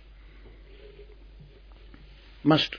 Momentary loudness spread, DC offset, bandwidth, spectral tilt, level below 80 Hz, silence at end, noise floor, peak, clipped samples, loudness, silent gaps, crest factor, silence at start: 28 LU; under 0.1%; 5.4 kHz; -6.5 dB/octave; -50 dBFS; 0 s; -49 dBFS; -8 dBFS; under 0.1%; -25 LUFS; none; 24 dB; 0.85 s